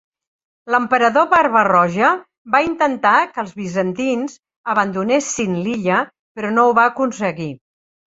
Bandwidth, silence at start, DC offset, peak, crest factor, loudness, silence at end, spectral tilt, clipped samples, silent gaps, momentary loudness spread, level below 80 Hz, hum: 8 kHz; 0.65 s; under 0.1%; 0 dBFS; 16 dB; -17 LUFS; 0.55 s; -5 dB/octave; under 0.1%; 2.38-2.45 s, 4.56-4.64 s, 6.19-6.35 s; 11 LU; -58 dBFS; none